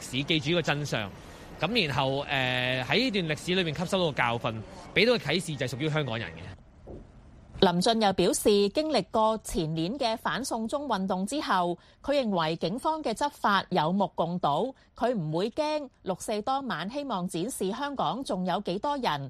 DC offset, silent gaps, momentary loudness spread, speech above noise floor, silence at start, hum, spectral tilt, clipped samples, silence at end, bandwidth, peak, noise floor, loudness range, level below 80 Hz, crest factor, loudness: under 0.1%; none; 9 LU; 23 dB; 0 s; none; -4.5 dB/octave; under 0.1%; 0 s; 15 kHz; -6 dBFS; -51 dBFS; 4 LU; -54 dBFS; 22 dB; -28 LUFS